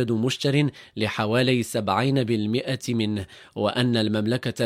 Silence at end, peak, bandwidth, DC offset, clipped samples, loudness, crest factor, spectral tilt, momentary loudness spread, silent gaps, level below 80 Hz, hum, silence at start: 0 s; -6 dBFS; 16 kHz; under 0.1%; under 0.1%; -24 LUFS; 18 dB; -6 dB/octave; 6 LU; none; -62 dBFS; none; 0 s